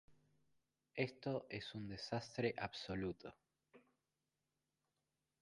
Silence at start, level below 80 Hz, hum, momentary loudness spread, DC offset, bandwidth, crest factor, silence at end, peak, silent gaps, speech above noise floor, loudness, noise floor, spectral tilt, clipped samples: 0.1 s; -72 dBFS; none; 8 LU; under 0.1%; 11 kHz; 26 dB; 1.6 s; -24 dBFS; none; over 45 dB; -45 LUFS; under -90 dBFS; -6 dB/octave; under 0.1%